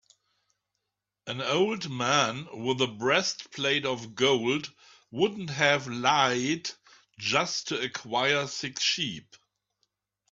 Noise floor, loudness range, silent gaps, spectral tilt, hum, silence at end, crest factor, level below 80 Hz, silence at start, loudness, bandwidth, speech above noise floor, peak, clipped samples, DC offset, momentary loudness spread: -85 dBFS; 3 LU; none; -3 dB/octave; 50 Hz at -65 dBFS; 1.1 s; 22 dB; -70 dBFS; 1.25 s; -27 LUFS; 7.8 kHz; 57 dB; -6 dBFS; under 0.1%; under 0.1%; 9 LU